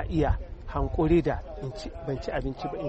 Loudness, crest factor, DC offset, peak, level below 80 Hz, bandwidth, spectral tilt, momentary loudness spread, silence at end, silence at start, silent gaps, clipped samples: -29 LUFS; 18 dB; under 0.1%; -10 dBFS; -36 dBFS; 8.4 kHz; -8 dB/octave; 13 LU; 0 s; 0 s; none; under 0.1%